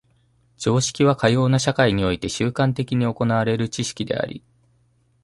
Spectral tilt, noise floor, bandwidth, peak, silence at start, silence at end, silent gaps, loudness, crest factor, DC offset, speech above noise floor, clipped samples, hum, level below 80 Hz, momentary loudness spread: -5.5 dB/octave; -62 dBFS; 11.5 kHz; -2 dBFS; 0.6 s; 0.85 s; none; -21 LUFS; 20 dB; under 0.1%; 42 dB; under 0.1%; none; -48 dBFS; 8 LU